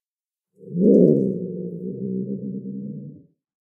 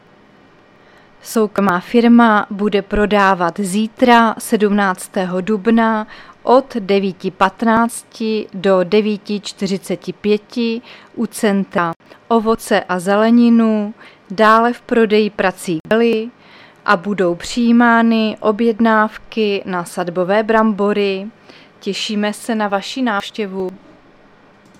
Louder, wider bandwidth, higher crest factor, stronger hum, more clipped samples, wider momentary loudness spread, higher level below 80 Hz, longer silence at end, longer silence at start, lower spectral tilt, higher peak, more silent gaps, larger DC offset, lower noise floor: second, -22 LUFS vs -15 LUFS; second, 0.8 kHz vs 14.5 kHz; about the same, 20 dB vs 16 dB; neither; neither; first, 19 LU vs 12 LU; second, -66 dBFS vs -46 dBFS; second, 0.45 s vs 1.05 s; second, 0.6 s vs 1.25 s; first, -14.5 dB/octave vs -5.5 dB/octave; second, -4 dBFS vs 0 dBFS; second, none vs 11.96-12.00 s, 15.80-15.84 s; neither; first, under -90 dBFS vs -47 dBFS